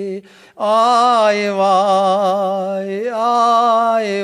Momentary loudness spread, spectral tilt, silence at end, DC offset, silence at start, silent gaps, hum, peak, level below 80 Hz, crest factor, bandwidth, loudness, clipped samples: 10 LU; -4.5 dB/octave; 0 s; under 0.1%; 0 s; none; none; -2 dBFS; -72 dBFS; 12 dB; 12.5 kHz; -15 LUFS; under 0.1%